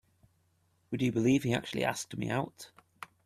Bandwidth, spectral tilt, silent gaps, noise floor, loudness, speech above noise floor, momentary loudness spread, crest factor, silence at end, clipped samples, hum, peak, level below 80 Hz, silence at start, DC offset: 14.5 kHz; -5.5 dB/octave; none; -72 dBFS; -32 LUFS; 41 dB; 22 LU; 18 dB; 0.2 s; under 0.1%; none; -14 dBFS; -64 dBFS; 0.9 s; under 0.1%